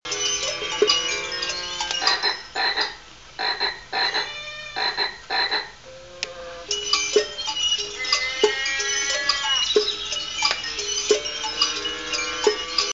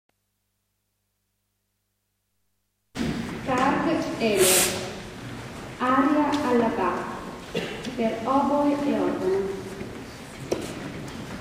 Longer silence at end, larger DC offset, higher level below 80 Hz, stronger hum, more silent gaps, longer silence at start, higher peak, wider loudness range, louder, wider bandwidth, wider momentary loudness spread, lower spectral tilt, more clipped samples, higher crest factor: about the same, 0 s vs 0 s; first, 0.2% vs under 0.1%; about the same, -54 dBFS vs -52 dBFS; second, none vs 50 Hz at -60 dBFS; neither; second, 0.05 s vs 2.95 s; first, -4 dBFS vs -8 dBFS; second, 4 LU vs 7 LU; about the same, -22 LUFS vs -24 LUFS; second, 8.2 kHz vs 16 kHz; second, 9 LU vs 17 LU; second, 0.5 dB/octave vs -3.5 dB/octave; neither; about the same, 22 dB vs 20 dB